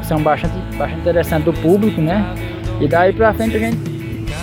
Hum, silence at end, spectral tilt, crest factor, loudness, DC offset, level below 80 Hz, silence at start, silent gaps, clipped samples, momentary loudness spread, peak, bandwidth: none; 0 s; -7 dB/octave; 14 dB; -17 LUFS; under 0.1%; -30 dBFS; 0 s; none; under 0.1%; 10 LU; -2 dBFS; 17 kHz